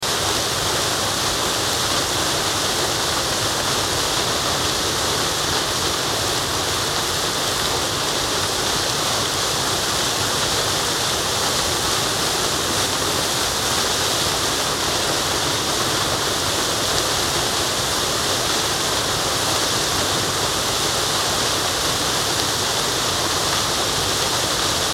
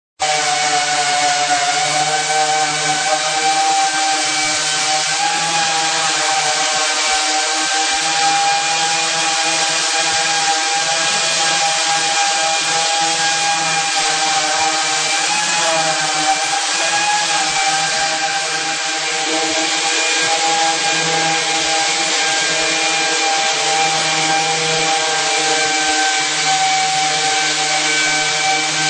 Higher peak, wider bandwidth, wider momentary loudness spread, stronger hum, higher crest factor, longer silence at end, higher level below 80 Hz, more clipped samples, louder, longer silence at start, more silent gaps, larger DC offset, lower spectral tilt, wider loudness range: about the same, -2 dBFS vs -2 dBFS; first, 17 kHz vs 10 kHz; about the same, 1 LU vs 1 LU; neither; about the same, 18 dB vs 14 dB; about the same, 0 s vs 0 s; first, -42 dBFS vs -62 dBFS; neither; second, -19 LUFS vs -14 LUFS; second, 0 s vs 0.2 s; neither; neither; first, -1.5 dB/octave vs 0 dB/octave; about the same, 1 LU vs 1 LU